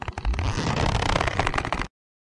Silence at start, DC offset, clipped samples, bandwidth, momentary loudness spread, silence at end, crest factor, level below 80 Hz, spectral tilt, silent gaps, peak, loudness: 0 s; under 0.1%; under 0.1%; 11.5 kHz; 6 LU; 0.45 s; 22 dB; -32 dBFS; -5 dB/octave; none; -4 dBFS; -26 LUFS